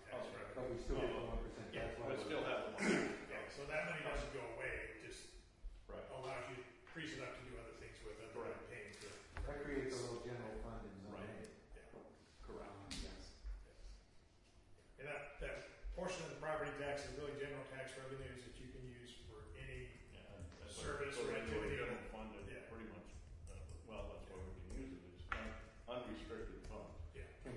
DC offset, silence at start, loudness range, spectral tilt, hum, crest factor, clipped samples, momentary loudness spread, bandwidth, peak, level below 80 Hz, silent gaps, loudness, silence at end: under 0.1%; 0 s; 10 LU; -5 dB/octave; none; 24 dB; under 0.1%; 14 LU; 11.5 kHz; -24 dBFS; -58 dBFS; none; -48 LUFS; 0 s